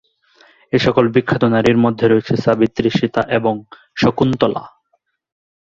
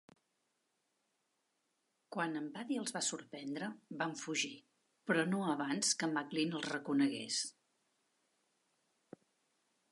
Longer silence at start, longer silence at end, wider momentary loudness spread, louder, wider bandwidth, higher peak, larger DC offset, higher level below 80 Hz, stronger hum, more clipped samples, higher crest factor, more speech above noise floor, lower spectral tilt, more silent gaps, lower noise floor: second, 0.75 s vs 2.1 s; second, 1 s vs 2.4 s; second, 7 LU vs 11 LU; first, -16 LUFS vs -38 LUFS; second, 7.6 kHz vs 11.5 kHz; first, 0 dBFS vs -20 dBFS; neither; first, -48 dBFS vs under -90 dBFS; neither; neither; about the same, 16 dB vs 20 dB; first, 51 dB vs 45 dB; first, -7 dB/octave vs -3 dB/octave; neither; second, -66 dBFS vs -83 dBFS